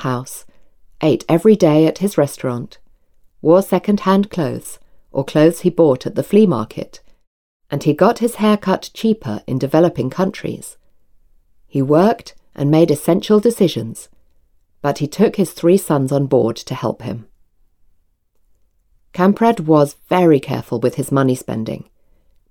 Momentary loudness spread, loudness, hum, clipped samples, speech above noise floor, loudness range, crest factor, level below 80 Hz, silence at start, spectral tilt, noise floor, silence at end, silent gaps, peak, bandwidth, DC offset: 14 LU; -16 LUFS; none; under 0.1%; 44 dB; 3 LU; 16 dB; -52 dBFS; 0 s; -7 dB/octave; -59 dBFS; 0.7 s; 7.27-7.60 s; 0 dBFS; 19 kHz; under 0.1%